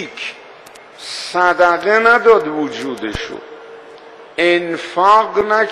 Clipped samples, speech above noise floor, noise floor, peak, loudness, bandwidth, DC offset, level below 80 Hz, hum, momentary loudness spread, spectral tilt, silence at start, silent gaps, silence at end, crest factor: under 0.1%; 25 dB; -39 dBFS; 0 dBFS; -14 LUFS; 12 kHz; under 0.1%; -46 dBFS; none; 17 LU; -4 dB/octave; 0 s; none; 0 s; 16 dB